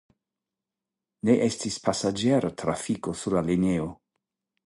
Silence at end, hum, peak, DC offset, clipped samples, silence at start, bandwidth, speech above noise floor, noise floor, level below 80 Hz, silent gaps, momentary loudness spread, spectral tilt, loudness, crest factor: 0.75 s; none; -8 dBFS; under 0.1%; under 0.1%; 1.25 s; 11.5 kHz; 63 dB; -88 dBFS; -54 dBFS; none; 7 LU; -5.5 dB/octave; -26 LUFS; 20 dB